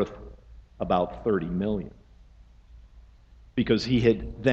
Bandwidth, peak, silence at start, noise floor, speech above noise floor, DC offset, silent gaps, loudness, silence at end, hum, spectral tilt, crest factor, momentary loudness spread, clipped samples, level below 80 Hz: 8 kHz; -8 dBFS; 0 s; -53 dBFS; 28 dB; under 0.1%; none; -27 LUFS; 0 s; none; -7 dB/octave; 20 dB; 17 LU; under 0.1%; -46 dBFS